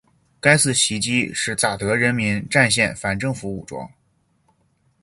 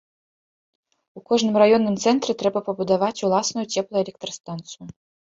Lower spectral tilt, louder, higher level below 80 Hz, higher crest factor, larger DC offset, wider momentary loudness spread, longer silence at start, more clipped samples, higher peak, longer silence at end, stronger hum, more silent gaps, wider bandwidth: about the same, -3.5 dB/octave vs -4.5 dB/octave; about the same, -19 LUFS vs -21 LUFS; first, -50 dBFS vs -64 dBFS; about the same, 22 dB vs 20 dB; neither; about the same, 15 LU vs 17 LU; second, 0.45 s vs 1.15 s; neither; first, 0 dBFS vs -4 dBFS; first, 1.15 s vs 0.5 s; neither; second, none vs 4.40-4.44 s; first, 11.5 kHz vs 7.8 kHz